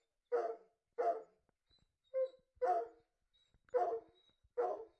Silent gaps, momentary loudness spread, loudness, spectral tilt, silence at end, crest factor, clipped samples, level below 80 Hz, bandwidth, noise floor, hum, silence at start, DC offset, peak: none; 10 LU; -41 LUFS; -5 dB/octave; 0.1 s; 18 dB; under 0.1%; -84 dBFS; 8 kHz; -79 dBFS; none; 0.3 s; under 0.1%; -26 dBFS